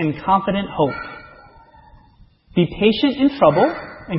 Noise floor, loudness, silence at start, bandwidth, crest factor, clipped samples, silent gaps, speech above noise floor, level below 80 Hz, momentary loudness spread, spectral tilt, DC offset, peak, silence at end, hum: -51 dBFS; -18 LUFS; 0 s; 5.8 kHz; 20 dB; under 0.1%; none; 34 dB; -46 dBFS; 16 LU; -10.5 dB/octave; under 0.1%; 0 dBFS; 0 s; none